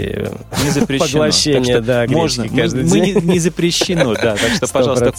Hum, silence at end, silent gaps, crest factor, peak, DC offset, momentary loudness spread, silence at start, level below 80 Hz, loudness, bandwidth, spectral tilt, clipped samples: none; 0 s; none; 14 dB; -2 dBFS; under 0.1%; 4 LU; 0 s; -36 dBFS; -14 LUFS; 16.5 kHz; -4.5 dB/octave; under 0.1%